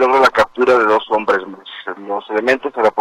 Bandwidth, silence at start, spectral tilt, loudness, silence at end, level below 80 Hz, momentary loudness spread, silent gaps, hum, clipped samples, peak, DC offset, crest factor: 13 kHz; 0 s; -4 dB/octave; -15 LUFS; 0 s; -52 dBFS; 16 LU; none; none; under 0.1%; -2 dBFS; under 0.1%; 14 dB